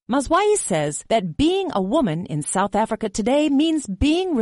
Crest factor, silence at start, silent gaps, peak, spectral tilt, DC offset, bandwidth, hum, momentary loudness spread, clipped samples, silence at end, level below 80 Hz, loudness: 12 dB; 0.1 s; none; -8 dBFS; -4.5 dB/octave; under 0.1%; 11.5 kHz; none; 5 LU; under 0.1%; 0 s; -40 dBFS; -21 LUFS